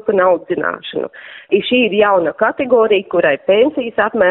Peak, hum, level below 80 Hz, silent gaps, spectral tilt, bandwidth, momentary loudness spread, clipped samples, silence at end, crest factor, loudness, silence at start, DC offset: -2 dBFS; none; -56 dBFS; none; -2.5 dB/octave; 4.1 kHz; 11 LU; under 0.1%; 0 s; 14 dB; -14 LUFS; 0.05 s; under 0.1%